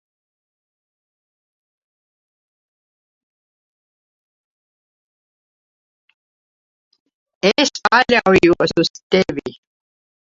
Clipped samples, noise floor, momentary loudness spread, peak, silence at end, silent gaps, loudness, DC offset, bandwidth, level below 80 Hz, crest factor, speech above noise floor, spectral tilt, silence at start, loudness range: under 0.1%; under -90 dBFS; 9 LU; 0 dBFS; 0.75 s; 8.90-8.94 s, 9.03-9.10 s; -15 LUFS; under 0.1%; 7.8 kHz; -52 dBFS; 22 dB; over 75 dB; -4.5 dB/octave; 7.45 s; 8 LU